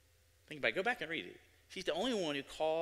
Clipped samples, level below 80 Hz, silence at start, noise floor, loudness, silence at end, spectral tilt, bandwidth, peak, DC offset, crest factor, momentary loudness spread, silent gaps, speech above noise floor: under 0.1%; -70 dBFS; 0.5 s; -69 dBFS; -38 LUFS; 0 s; -3.5 dB/octave; 16 kHz; -18 dBFS; under 0.1%; 20 dB; 14 LU; none; 31 dB